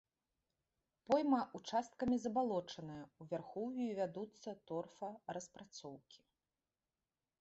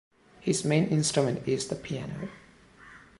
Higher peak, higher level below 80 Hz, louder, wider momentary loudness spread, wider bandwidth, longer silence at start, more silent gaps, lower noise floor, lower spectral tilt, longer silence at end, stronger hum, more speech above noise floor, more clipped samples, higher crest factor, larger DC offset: second, -22 dBFS vs -10 dBFS; second, -76 dBFS vs -60 dBFS; second, -41 LUFS vs -28 LUFS; first, 16 LU vs 13 LU; second, 8 kHz vs 11.5 kHz; first, 1.1 s vs 0.4 s; neither; first, under -90 dBFS vs -54 dBFS; about the same, -5 dB/octave vs -5 dB/octave; first, 1.25 s vs 0.2 s; neither; first, over 49 dB vs 26 dB; neither; about the same, 22 dB vs 20 dB; neither